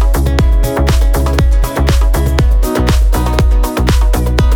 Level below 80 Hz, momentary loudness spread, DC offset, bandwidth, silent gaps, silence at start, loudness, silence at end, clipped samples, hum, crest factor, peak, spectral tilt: -10 dBFS; 1 LU; under 0.1%; 17.5 kHz; none; 0 s; -13 LUFS; 0 s; under 0.1%; none; 10 dB; 0 dBFS; -6 dB/octave